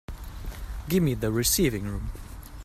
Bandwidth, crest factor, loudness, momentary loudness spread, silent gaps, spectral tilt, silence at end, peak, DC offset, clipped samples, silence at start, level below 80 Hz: 16 kHz; 18 dB; -26 LUFS; 19 LU; none; -4.5 dB/octave; 0 s; -10 dBFS; under 0.1%; under 0.1%; 0.1 s; -38 dBFS